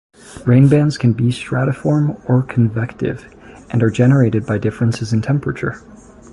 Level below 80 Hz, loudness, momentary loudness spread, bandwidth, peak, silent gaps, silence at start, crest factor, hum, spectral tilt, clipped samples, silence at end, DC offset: -44 dBFS; -16 LUFS; 11 LU; 11.5 kHz; -2 dBFS; none; 0.3 s; 14 dB; none; -8 dB/octave; under 0.1%; 0.4 s; under 0.1%